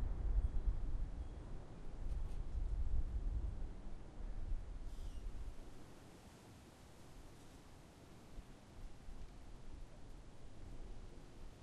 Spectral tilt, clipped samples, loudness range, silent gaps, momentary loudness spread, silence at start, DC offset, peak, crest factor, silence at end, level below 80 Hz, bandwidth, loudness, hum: -7 dB/octave; under 0.1%; 13 LU; none; 16 LU; 0 s; under 0.1%; -26 dBFS; 18 dB; 0 s; -44 dBFS; 10.5 kHz; -50 LUFS; none